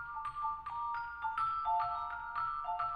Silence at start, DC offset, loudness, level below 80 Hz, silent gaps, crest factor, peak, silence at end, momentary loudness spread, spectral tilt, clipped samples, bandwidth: 0 s; under 0.1%; -37 LUFS; -62 dBFS; none; 14 dB; -24 dBFS; 0 s; 6 LU; -4.5 dB/octave; under 0.1%; 10.5 kHz